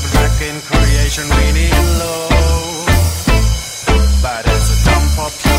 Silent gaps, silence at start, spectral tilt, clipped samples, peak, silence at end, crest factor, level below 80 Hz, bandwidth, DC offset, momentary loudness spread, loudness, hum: none; 0 s; -4.5 dB/octave; under 0.1%; 0 dBFS; 0 s; 12 dB; -14 dBFS; 16.5 kHz; under 0.1%; 4 LU; -14 LUFS; none